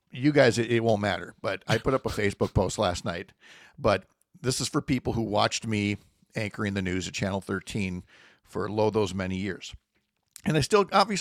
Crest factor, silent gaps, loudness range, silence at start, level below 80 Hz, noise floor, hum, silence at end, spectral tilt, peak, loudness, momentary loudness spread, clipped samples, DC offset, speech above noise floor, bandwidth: 20 dB; none; 4 LU; 0.15 s; -50 dBFS; -75 dBFS; none; 0 s; -5 dB/octave; -8 dBFS; -27 LUFS; 12 LU; under 0.1%; under 0.1%; 48 dB; 15.5 kHz